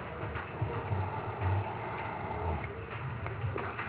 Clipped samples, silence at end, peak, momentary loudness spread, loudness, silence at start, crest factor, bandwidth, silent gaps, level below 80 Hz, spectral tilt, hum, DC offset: under 0.1%; 0 s; -20 dBFS; 5 LU; -37 LUFS; 0 s; 16 dB; 4 kHz; none; -46 dBFS; -6 dB/octave; none; under 0.1%